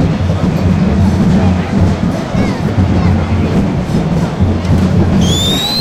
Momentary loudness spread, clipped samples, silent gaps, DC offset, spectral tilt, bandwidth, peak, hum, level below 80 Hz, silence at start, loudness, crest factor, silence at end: 4 LU; under 0.1%; none; under 0.1%; -6.5 dB/octave; 15.5 kHz; -2 dBFS; none; -24 dBFS; 0 s; -12 LUFS; 10 dB; 0 s